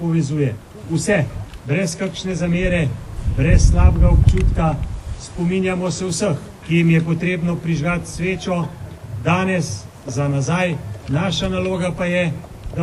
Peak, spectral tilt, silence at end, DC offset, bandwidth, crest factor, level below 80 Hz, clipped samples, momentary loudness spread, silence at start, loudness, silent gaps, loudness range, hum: 0 dBFS; -6 dB/octave; 0 s; under 0.1%; 12 kHz; 18 dB; -24 dBFS; under 0.1%; 13 LU; 0 s; -19 LUFS; none; 4 LU; none